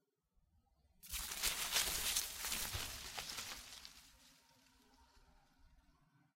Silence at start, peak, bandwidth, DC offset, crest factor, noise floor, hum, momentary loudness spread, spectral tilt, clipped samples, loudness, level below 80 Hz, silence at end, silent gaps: 1.05 s; -20 dBFS; 16 kHz; under 0.1%; 26 dB; -80 dBFS; none; 18 LU; 0 dB/octave; under 0.1%; -40 LUFS; -60 dBFS; 0.55 s; none